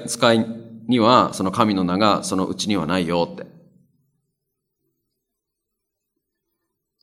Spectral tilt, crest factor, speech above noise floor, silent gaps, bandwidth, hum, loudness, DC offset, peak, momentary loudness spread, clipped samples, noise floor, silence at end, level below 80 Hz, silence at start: -5 dB/octave; 22 dB; 61 dB; none; 15 kHz; none; -19 LUFS; under 0.1%; 0 dBFS; 11 LU; under 0.1%; -80 dBFS; 3.55 s; -62 dBFS; 0 s